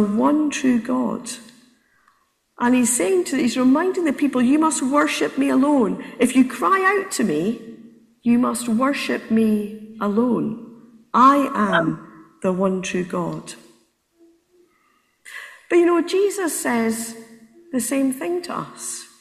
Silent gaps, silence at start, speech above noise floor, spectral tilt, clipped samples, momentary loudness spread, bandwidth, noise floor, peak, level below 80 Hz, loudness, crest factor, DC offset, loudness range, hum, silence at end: none; 0 s; 44 dB; -4.5 dB/octave; under 0.1%; 13 LU; 15.5 kHz; -63 dBFS; -2 dBFS; -62 dBFS; -20 LUFS; 20 dB; under 0.1%; 6 LU; none; 0.15 s